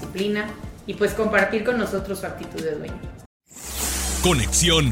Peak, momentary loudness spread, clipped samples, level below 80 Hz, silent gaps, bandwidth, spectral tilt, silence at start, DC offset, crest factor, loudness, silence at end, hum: -6 dBFS; 17 LU; under 0.1%; -34 dBFS; 3.26-3.40 s; 16.5 kHz; -3.5 dB/octave; 0 s; under 0.1%; 18 dB; -22 LUFS; 0 s; none